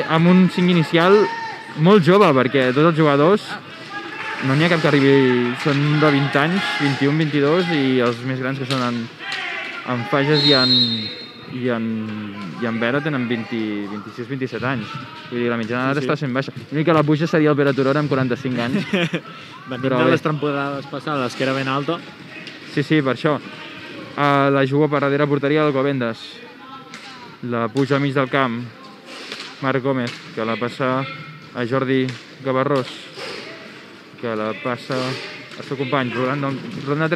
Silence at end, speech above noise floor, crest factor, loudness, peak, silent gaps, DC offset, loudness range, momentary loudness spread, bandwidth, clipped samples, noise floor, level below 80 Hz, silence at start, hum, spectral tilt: 0 s; 21 dB; 20 dB; -19 LUFS; 0 dBFS; none; under 0.1%; 7 LU; 17 LU; 12.5 kHz; under 0.1%; -40 dBFS; -70 dBFS; 0 s; none; -6.5 dB/octave